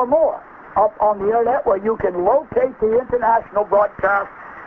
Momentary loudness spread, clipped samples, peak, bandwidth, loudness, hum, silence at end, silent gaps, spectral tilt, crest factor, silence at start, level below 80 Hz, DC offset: 4 LU; under 0.1%; -4 dBFS; 3.5 kHz; -18 LUFS; none; 0 s; none; -9.5 dB/octave; 14 dB; 0 s; -48 dBFS; under 0.1%